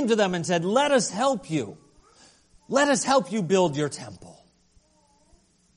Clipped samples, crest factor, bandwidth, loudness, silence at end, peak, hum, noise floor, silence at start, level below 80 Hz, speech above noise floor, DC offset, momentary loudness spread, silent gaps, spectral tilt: under 0.1%; 18 dB; 10.5 kHz; -23 LUFS; 1.45 s; -6 dBFS; none; -62 dBFS; 0 s; -64 dBFS; 39 dB; under 0.1%; 10 LU; none; -4 dB/octave